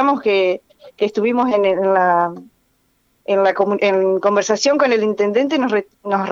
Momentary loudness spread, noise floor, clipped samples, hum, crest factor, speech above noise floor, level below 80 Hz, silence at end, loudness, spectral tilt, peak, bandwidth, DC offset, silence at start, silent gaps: 7 LU; -62 dBFS; under 0.1%; none; 14 dB; 46 dB; -68 dBFS; 0 s; -17 LUFS; -4.5 dB/octave; -2 dBFS; 7.8 kHz; under 0.1%; 0 s; none